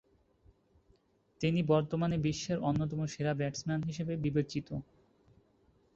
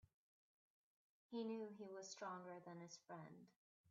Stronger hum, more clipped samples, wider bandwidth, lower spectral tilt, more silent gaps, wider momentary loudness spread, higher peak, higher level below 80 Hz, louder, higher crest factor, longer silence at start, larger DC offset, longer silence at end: neither; neither; about the same, 7.8 kHz vs 7.4 kHz; first, -6.5 dB/octave vs -4.5 dB/octave; second, none vs 3.56-3.84 s; about the same, 7 LU vs 9 LU; first, -16 dBFS vs -40 dBFS; first, -60 dBFS vs under -90 dBFS; first, -34 LUFS vs -54 LUFS; about the same, 20 dB vs 16 dB; about the same, 1.4 s vs 1.3 s; neither; first, 1.1 s vs 0 s